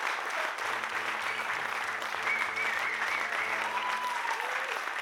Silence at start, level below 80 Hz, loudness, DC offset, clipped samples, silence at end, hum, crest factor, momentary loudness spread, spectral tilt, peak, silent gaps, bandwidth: 0 s; -78 dBFS; -31 LUFS; under 0.1%; under 0.1%; 0 s; none; 18 dB; 3 LU; -0.5 dB/octave; -14 dBFS; none; 19 kHz